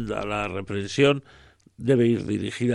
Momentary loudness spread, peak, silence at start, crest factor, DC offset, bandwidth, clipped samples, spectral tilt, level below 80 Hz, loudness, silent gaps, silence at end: 9 LU; -6 dBFS; 0 s; 18 dB; under 0.1%; 11 kHz; under 0.1%; -6 dB/octave; -54 dBFS; -24 LUFS; none; 0 s